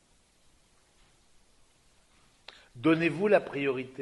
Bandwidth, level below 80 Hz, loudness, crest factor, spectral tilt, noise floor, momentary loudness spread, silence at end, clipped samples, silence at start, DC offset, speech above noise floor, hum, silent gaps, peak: 11 kHz; -68 dBFS; -27 LUFS; 22 dB; -7 dB/octave; -64 dBFS; 25 LU; 0 s; under 0.1%; 2.75 s; under 0.1%; 37 dB; none; none; -10 dBFS